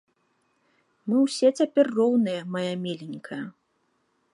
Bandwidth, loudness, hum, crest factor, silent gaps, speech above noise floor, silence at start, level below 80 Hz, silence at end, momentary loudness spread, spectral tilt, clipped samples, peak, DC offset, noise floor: 11.5 kHz; -24 LUFS; none; 18 dB; none; 47 dB; 1.05 s; -80 dBFS; 0.85 s; 15 LU; -6 dB/octave; under 0.1%; -8 dBFS; under 0.1%; -71 dBFS